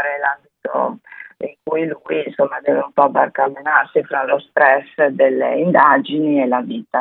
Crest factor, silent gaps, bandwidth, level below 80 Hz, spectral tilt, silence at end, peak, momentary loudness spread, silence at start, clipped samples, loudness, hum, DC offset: 16 dB; none; 4.1 kHz; -72 dBFS; -9.5 dB/octave; 0 s; 0 dBFS; 11 LU; 0 s; under 0.1%; -17 LUFS; none; under 0.1%